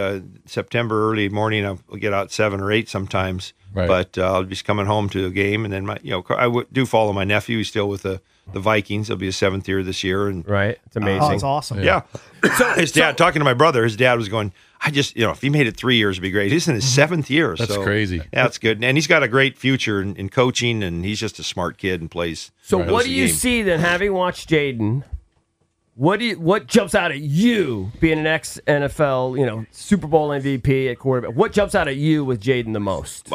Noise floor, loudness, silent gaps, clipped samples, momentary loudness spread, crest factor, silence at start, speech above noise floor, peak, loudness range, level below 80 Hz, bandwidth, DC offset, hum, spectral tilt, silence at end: -67 dBFS; -19 LUFS; none; under 0.1%; 9 LU; 18 dB; 0 s; 48 dB; -2 dBFS; 4 LU; -44 dBFS; 15.5 kHz; under 0.1%; none; -5 dB/octave; 0 s